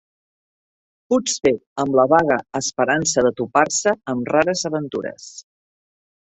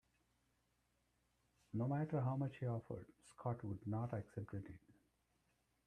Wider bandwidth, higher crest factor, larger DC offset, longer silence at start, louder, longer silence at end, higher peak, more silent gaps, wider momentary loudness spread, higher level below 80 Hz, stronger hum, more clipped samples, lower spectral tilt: second, 8.4 kHz vs 10 kHz; about the same, 20 dB vs 18 dB; neither; second, 1.1 s vs 1.75 s; first, -19 LUFS vs -45 LUFS; second, 0.8 s vs 0.95 s; first, -2 dBFS vs -28 dBFS; first, 1.66-1.76 s vs none; about the same, 11 LU vs 12 LU; first, -58 dBFS vs -74 dBFS; neither; neither; second, -3.5 dB/octave vs -9.5 dB/octave